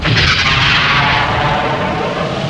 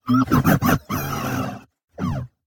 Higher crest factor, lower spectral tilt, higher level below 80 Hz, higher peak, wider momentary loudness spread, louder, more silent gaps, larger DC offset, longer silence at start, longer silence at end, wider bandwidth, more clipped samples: about the same, 14 dB vs 18 dB; second, -4.5 dB/octave vs -6 dB/octave; first, -30 dBFS vs -42 dBFS; first, 0 dBFS vs -4 dBFS; second, 7 LU vs 12 LU; first, -12 LUFS vs -21 LUFS; second, none vs 1.84-1.88 s; first, 0.4% vs under 0.1%; about the same, 0 s vs 0.05 s; second, 0 s vs 0.2 s; second, 11 kHz vs 18 kHz; neither